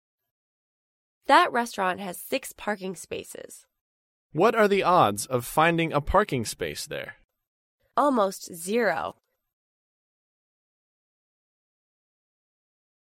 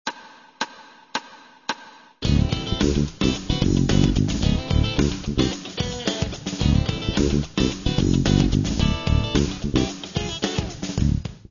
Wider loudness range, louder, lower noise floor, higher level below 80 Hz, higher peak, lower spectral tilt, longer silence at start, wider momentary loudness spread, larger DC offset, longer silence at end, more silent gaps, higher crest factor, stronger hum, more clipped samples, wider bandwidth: first, 7 LU vs 3 LU; about the same, -25 LUFS vs -23 LUFS; first, under -90 dBFS vs -46 dBFS; second, -50 dBFS vs -30 dBFS; about the same, -6 dBFS vs -4 dBFS; about the same, -4.5 dB/octave vs -5.5 dB/octave; first, 1.3 s vs 0.05 s; first, 16 LU vs 12 LU; neither; first, 4 s vs 0.15 s; first, 3.81-4.30 s, 7.25-7.29 s, 7.47-7.78 s vs none; about the same, 22 dB vs 18 dB; neither; neither; first, 16.5 kHz vs 7.4 kHz